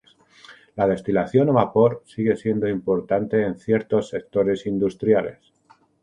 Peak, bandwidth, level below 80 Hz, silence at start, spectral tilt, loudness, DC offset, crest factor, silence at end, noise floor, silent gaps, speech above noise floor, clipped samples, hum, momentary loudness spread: -2 dBFS; 10 kHz; -54 dBFS; 0.5 s; -8.5 dB/octave; -22 LUFS; under 0.1%; 20 dB; 0.7 s; -58 dBFS; none; 37 dB; under 0.1%; none; 6 LU